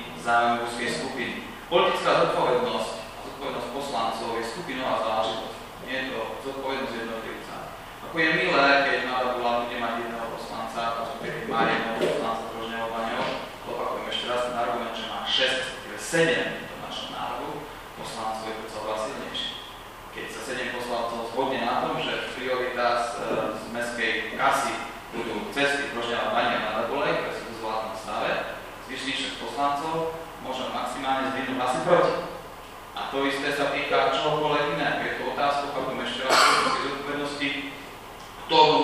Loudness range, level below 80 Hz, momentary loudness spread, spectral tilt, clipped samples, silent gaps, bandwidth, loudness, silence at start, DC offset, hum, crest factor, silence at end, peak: 6 LU; -54 dBFS; 13 LU; -3.5 dB/octave; under 0.1%; none; 15.5 kHz; -26 LUFS; 0 s; under 0.1%; none; 22 dB; 0 s; -4 dBFS